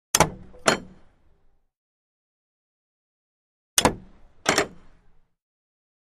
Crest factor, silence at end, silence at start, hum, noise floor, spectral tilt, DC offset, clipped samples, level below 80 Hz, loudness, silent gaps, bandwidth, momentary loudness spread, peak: 28 dB; 1.35 s; 0.15 s; none; -60 dBFS; -2 dB/octave; under 0.1%; under 0.1%; -50 dBFS; -24 LUFS; 1.77-3.77 s; 15 kHz; 8 LU; -2 dBFS